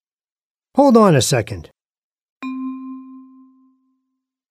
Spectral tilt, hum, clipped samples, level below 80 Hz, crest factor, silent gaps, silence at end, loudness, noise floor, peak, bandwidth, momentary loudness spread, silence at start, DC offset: -5.5 dB/octave; none; under 0.1%; -54 dBFS; 18 dB; 1.98-2.16 s, 2.22-2.36 s; 1.3 s; -15 LUFS; under -90 dBFS; 0 dBFS; 15.5 kHz; 22 LU; 0.75 s; under 0.1%